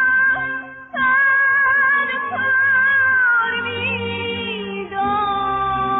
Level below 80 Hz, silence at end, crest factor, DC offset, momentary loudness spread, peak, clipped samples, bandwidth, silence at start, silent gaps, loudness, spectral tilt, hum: -50 dBFS; 0 s; 10 dB; under 0.1%; 11 LU; -8 dBFS; under 0.1%; 4 kHz; 0 s; none; -17 LUFS; -0.5 dB/octave; none